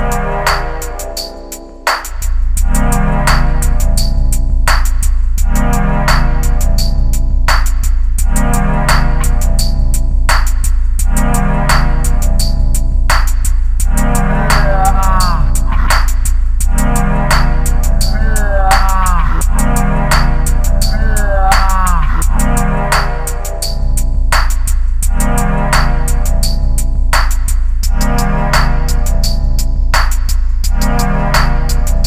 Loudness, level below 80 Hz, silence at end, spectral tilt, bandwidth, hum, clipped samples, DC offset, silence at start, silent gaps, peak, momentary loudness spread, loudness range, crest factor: -14 LUFS; -10 dBFS; 0 s; -4.5 dB/octave; 15.5 kHz; none; under 0.1%; under 0.1%; 0 s; none; 0 dBFS; 4 LU; 2 LU; 10 dB